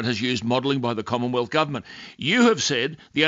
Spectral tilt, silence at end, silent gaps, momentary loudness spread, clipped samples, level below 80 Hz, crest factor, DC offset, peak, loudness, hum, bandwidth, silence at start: -4 dB/octave; 0 s; none; 9 LU; under 0.1%; -62 dBFS; 18 dB; under 0.1%; -6 dBFS; -22 LUFS; none; 7.8 kHz; 0 s